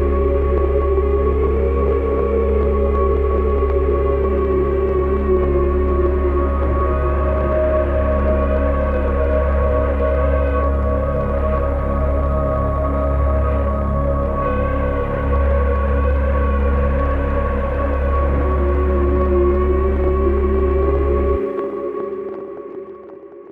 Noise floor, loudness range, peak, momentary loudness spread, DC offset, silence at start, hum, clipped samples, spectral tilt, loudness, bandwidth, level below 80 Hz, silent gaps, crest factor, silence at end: -37 dBFS; 2 LU; -6 dBFS; 3 LU; under 0.1%; 0 s; none; under 0.1%; -10.5 dB/octave; -18 LUFS; 3.6 kHz; -20 dBFS; none; 12 dB; 0 s